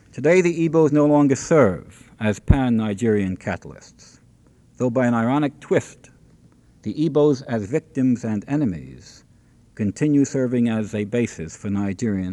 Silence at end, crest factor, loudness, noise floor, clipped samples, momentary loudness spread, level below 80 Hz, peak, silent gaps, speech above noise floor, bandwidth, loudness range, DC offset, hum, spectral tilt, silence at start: 0 s; 20 dB; -21 LUFS; -54 dBFS; under 0.1%; 12 LU; -38 dBFS; 0 dBFS; none; 33 dB; 11 kHz; 5 LU; under 0.1%; none; -7 dB/octave; 0.15 s